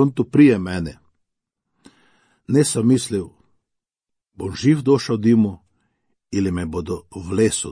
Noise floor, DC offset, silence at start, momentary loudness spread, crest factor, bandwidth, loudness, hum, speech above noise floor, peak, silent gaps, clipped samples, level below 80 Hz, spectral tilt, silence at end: -83 dBFS; under 0.1%; 0 s; 15 LU; 18 dB; 10.5 kHz; -19 LUFS; none; 65 dB; -2 dBFS; none; under 0.1%; -50 dBFS; -6 dB/octave; 0 s